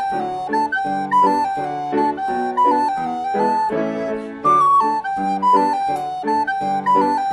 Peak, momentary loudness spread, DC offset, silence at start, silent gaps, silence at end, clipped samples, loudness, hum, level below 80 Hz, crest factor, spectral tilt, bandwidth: -4 dBFS; 7 LU; under 0.1%; 0 s; none; 0 s; under 0.1%; -18 LUFS; none; -58 dBFS; 14 dB; -5.5 dB/octave; 12 kHz